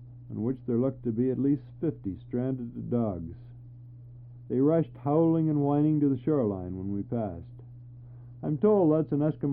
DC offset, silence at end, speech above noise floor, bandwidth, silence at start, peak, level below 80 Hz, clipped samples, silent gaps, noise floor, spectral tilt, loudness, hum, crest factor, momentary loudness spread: under 0.1%; 0 s; 20 dB; 3.5 kHz; 0 s; -12 dBFS; -58 dBFS; under 0.1%; none; -47 dBFS; -13.5 dB/octave; -28 LUFS; none; 16 dB; 23 LU